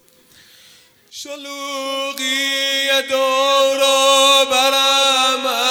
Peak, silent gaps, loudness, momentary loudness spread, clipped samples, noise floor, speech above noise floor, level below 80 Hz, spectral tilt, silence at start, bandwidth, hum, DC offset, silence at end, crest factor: -2 dBFS; none; -14 LUFS; 16 LU; under 0.1%; -49 dBFS; 29 dB; -68 dBFS; 1.5 dB/octave; 1.15 s; 18.5 kHz; none; under 0.1%; 0 s; 16 dB